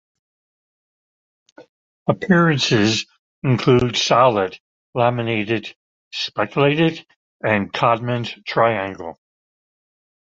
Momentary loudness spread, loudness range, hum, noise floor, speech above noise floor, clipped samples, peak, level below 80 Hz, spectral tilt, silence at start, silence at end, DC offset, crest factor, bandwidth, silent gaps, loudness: 14 LU; 4 LU; none; under -90 dBFS; over 72 dB; under 0.1%; -2 dBFS; -52 dBFS; -5.5 dB/octave; 1.6 s; 1.15 s; under 0.1%; 18 dB; 7.8 kHz; 1.69-2.06 s, 3.19-3.42 s, 4.60-4.93 s, 5.76-6.11 s, 7.16-7.40 s; -19 LUFS